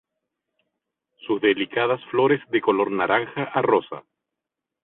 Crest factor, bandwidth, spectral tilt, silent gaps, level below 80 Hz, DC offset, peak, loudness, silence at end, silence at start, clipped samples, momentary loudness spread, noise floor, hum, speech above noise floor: 20 dB; 4.1 kHz; -10 dB/octave; none; -66 dBFS; under 0.1%; -4 dBFS; -22 LUFS; 0.85 s; 1.25 s; under 0.1%; 8 LU; -85 dBFS; none; 63 dB